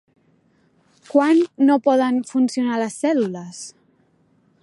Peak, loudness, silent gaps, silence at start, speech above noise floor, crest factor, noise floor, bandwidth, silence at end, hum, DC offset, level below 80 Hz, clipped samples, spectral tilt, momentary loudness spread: -4 dBFS; -19 LUFS; none; 1.15 s; 42 dB; 16 dB; -60 dBFS; 11.5 kHz; 0.95 s; none; under 0.1%; -76 dBFS; under 0.1%; -5 dB/octave; 17 LU